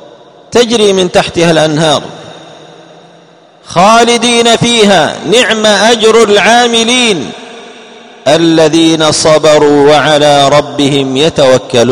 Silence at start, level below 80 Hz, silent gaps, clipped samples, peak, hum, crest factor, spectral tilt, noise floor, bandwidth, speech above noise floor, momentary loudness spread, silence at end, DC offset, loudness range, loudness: 0.5 s; -42 dBFS; none; 3%; 0 dBFS; none; 8 dB; -3.5 dB/octave; -39 dBFS; 16 kHz; 33 dB; 5 LU; 0 s; under 0.1%; 5 LU; -6 LUFS